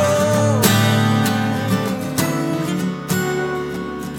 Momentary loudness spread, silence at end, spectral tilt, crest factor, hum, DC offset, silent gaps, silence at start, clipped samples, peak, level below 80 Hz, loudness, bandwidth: 9 LU; 0 s; -5 dB/octave; 16 dB; none; under 0.1%; none; 0 s; under 0.1%; -2 dBFS; -50 dBFS; -18 LUFS; 18 kHz